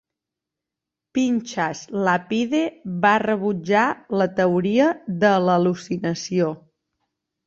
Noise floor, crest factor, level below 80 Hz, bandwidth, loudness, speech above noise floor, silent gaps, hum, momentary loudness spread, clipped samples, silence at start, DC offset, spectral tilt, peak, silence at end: -86 dBFS; 18 dB; -64 dBFS; 7.8 kHz; -21 LUFS; 65 dB; none; none; 8 LU; under 0.1%; 1.15 s; under 0.1%; -6 dB/octave; -4 dBFS; 0.9 s